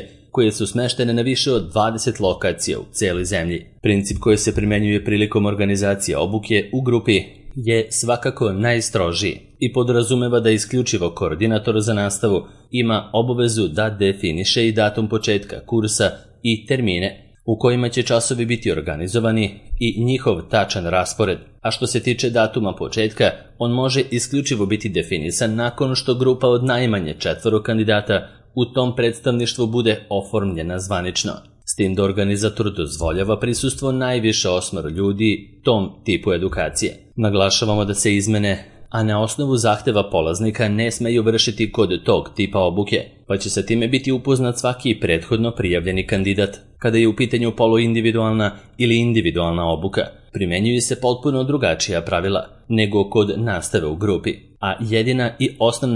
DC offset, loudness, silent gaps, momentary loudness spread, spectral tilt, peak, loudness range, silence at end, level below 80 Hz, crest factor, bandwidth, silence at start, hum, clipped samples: under 0.1%; -19 LUFS; none; 6 LU; -5 dB/octave; 0 dBFS; 2 LU; 0 s; -42 dBFS; 18 dB; 11.5 kHz; 0 s; none; under 0.1%